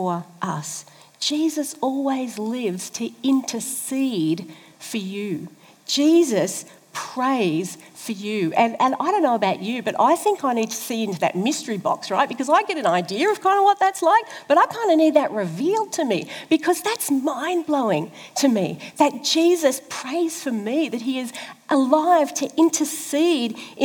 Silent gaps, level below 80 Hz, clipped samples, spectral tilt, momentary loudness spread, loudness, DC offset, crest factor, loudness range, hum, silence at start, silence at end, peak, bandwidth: none; -80 dBFS; under 0.1%; -4 dB/octave; 11 LU; -21 LUFS; under 0.1%; 18 dB; 5 LU; none; 0 s; 0 s; -4 dBFS; over 20 kHz